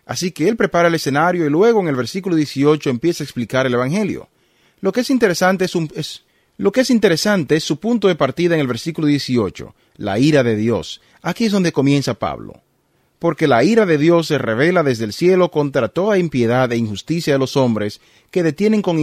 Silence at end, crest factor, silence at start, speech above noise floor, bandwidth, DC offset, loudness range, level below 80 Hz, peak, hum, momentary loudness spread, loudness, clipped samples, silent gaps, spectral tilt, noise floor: 0 s; 16 dB; 0.1 s; 45 dB; 15.5 kHz; under 0.1%; 3 LU; -54 dBFS; 0 dBFS; none; 10 LU; -17 LUFS; under 0.1%; none; -6 dB/octave; -62 dBFS